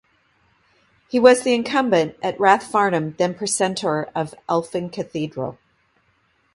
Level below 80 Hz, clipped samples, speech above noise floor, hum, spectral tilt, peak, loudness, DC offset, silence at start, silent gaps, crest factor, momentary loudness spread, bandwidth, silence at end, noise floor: -62 dBFS; under 0.1%; 44 dB; none; -4.5 dB/octave; 0 dBFS; -20 LUFS; under 0.1%; 1.15 s; none; 20 dB; 13 LU; 11.5 kHz; 1 s; -64 dBFS